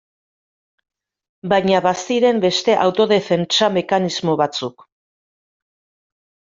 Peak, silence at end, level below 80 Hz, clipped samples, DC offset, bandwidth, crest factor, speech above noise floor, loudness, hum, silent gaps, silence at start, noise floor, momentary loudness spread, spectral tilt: -2 dBFS; 1.85 s; -62 dBFS; under 0.1%; under 0.1%; 7.8 kHz; 18 dB; over 73 dB; -17 LUFS; none; none; 1.45 s; under -90 dBFS; 5 LU; -4.5 dB/octave